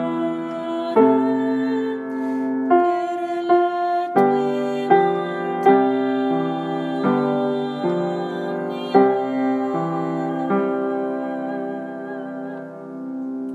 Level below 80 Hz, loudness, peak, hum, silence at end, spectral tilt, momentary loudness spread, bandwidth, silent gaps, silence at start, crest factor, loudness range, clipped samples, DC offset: -78 dBFS; -21 LUFS; -2 dBFS; none; 0 s; -8 dB/octave; 12 LU; 8 kHz; none; 0 s; 20 dB; 5 LU; under 0.1%; under 0.1%